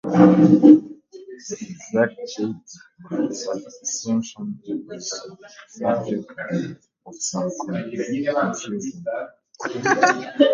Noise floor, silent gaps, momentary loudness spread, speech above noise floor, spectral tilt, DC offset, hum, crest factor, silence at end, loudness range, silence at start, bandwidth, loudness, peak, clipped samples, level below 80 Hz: -40 dBFS; none; 20 LU; 20 dB; -5.5 dB/octave; under 0.1%; none; 20 dB; 0 s; 8 LU; 0.05 s; 7.6 kHz; -21 LUFS; 0 dBFS; under 0.1%; -66 dBFS